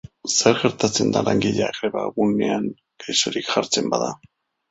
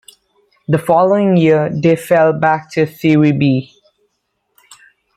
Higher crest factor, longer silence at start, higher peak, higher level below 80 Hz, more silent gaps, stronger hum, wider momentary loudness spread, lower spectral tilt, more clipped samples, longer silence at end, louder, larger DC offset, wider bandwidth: first, 20 dB vs 14 dB; second, 0.25 s vs 0.7 s; about the same, -2 dBFS vs -2 dBFS; about the same, -56 dBFS vs -56 dBFS; neither; neither; about the same, 8 LU vs 7 LU; second, -3.5 dB/octave vs -7.5 dB/octave; neither; second, 0.55 s vs 1.5 s; second, -21 LUFS vs -13 LUFS; neither; second, 8.4 kHz vs 14.5 kHz